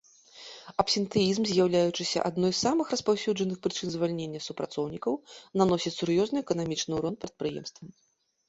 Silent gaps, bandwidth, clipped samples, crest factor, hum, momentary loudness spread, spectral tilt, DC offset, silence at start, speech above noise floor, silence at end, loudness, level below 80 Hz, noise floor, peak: none; 8.2 kHz; under 0.1%; 20 dB; none; 10 LU; -5 dB/octave; under 0.1%; 0.35 s; 22 dB; 0.6 s; -29 LUFS; -62 dBFS; -50 dBFS; -8 dBFS